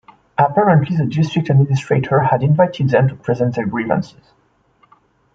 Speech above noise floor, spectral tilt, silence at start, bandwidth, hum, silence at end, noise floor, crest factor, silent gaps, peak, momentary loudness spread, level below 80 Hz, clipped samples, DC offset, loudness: 41 dB; -8.5 dB/octave; 0.4 s; 7.6 kHz; none; 1.25 s; -57 dBFS; 14 dB; none; -2 dBFS; 7 LU; -54 dBFS; under 0.1%; under 0.1%; -16 LUFS